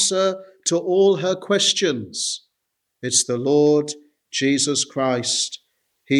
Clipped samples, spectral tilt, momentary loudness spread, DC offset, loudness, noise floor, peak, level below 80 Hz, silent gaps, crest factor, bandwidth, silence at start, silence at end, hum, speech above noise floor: under 0.1%; -3 dB/octave; 11 LU; under 0.1%; -20 LUFS; -77 dBFS; -4 dBFS; -70 dBFS; none; 16 dB; 12.5 kHz; 0 s; 0 s; none; 57 dB